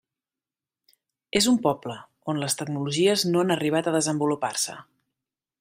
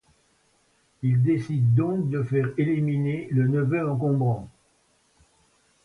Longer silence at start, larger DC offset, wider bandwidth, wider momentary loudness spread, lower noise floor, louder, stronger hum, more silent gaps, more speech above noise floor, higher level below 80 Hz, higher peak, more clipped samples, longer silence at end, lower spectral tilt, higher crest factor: first, 1.35 s vs 1 s; neither; first, 16 kHz vs 6.2 kHz; first, 11 LU vs 5 LU; first, under -90 dBFS vs -65 dBFS; about the same, -24 LUFS vs -24 LUFS; neither; neither; first, over 66 dB vs 42 dB; about the same, -64 dBFS vs -60 dBFS; first, -6 dBFS vs -12 dBFS; neither; second, 0.8 s vs 1.35 s; second, -4 dB/octave vs -10 dB/octave; first, 20 dB vs 14 dB